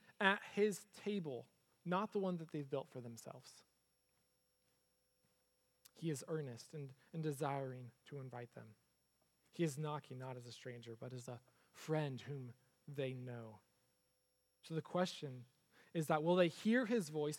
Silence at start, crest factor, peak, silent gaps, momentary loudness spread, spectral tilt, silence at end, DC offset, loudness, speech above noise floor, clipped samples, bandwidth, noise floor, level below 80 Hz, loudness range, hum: 0.1 s; 28 dB; -16 dBFS; none; 18 LU; -5.5 dB/octave; 0 s; under 0.1%; -43 LUFS; 40 dB; under 0.1%; 17 kHz; -83 dBFS; under -90 dBFS; 10 LU; none